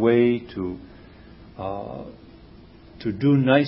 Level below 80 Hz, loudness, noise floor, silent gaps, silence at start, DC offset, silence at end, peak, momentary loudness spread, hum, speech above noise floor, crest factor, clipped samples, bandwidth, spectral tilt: -50 dBFS; -24 LUFS; -47 dBFS; none; 0 s; under 0.1%; 0 s; -2 dBFS; 23 LU; none; 25 dB; 20 dB; under 0.1%; 5.8 kHz; -12 dB/octave